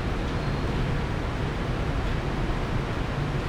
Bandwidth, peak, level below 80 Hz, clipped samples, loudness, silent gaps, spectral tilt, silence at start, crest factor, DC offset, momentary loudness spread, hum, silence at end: 12.5 kHz; -14 dBFS; -32 dBFS; under 0.1%; -29 LUFS; none; -7 dB/octave; 0 s; 12 dB; under 0.1%; 1 LU; none; 0 s